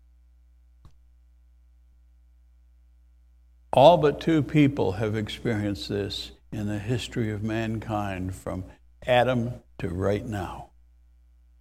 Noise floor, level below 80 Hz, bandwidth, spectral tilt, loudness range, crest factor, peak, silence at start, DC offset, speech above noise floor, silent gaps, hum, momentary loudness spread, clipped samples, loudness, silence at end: -56 dBFS; -48 dBFS; 15.5 kHz; -7 dB/octave; 7 LU; 24 dB; -2 dBFS; 3.75 s; under 0.1%; 32 dB; none; none; 16 LU; under 0.1%; -25 LUFS; 0.95 s